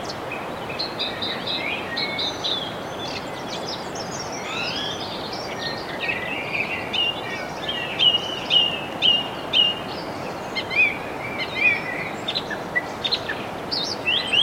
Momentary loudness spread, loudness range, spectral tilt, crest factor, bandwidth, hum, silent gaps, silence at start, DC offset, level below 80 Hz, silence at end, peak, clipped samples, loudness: 12 LU; 7 LU; -2.5 dB/octave; 20 dB; 16.5 kHz; none; none; 0 s; under 0.1%; -54 dBFS; 0 s; -6 dBFS; under 0.1%; -23 LUFS